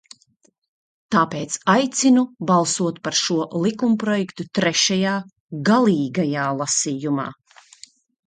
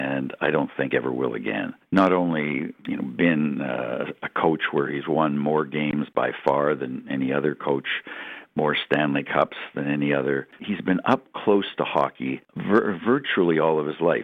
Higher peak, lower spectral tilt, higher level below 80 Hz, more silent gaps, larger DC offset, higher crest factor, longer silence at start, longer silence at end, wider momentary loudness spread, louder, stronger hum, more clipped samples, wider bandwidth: first, -2 dBFS vs -6 dBFS; second, -4 dB/octave vs -8 dB/octave; about the same, -64 dBFS vs -64 dBFS; first, 5.40-5.49 s vs none; neither; about the same, 18 dB vs 18 dB; first, 1.1 s vs 0 s; first, 0.95 s vs 0 s; about the same, 7 LU vs 8 LU; first, -20 LUFS vs -24 LUFS; neither; neither; first, 9.4 kHz vs 6.6 kHz